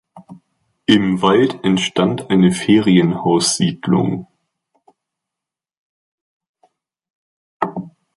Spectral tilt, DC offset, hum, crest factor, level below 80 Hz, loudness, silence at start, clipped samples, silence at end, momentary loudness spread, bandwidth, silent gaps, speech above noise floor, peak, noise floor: -5 dB/octave; under 0.1%; none; 16 dB; -54 dBFS; -16 LUFS; 0.15 s; under 0.1%; 0.3 s; 11 LU; 11.5 kHz; 5.77-6.40 s, 6.49-6.54 s, 7.10-7.60 s; 71 dB; -2 dBFS; -86 dBFS